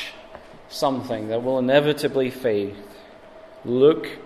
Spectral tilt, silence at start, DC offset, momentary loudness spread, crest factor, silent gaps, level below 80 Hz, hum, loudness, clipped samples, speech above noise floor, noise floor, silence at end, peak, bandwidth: -6 dB/octave; 0 s; under 0.1%; 18 LU; 18 dB; none; -58 dBFS; none; -22 LUFS; under 0.1%; 23 dB; -45 dBFS; 0 s; -4 dBFS; 14 kHz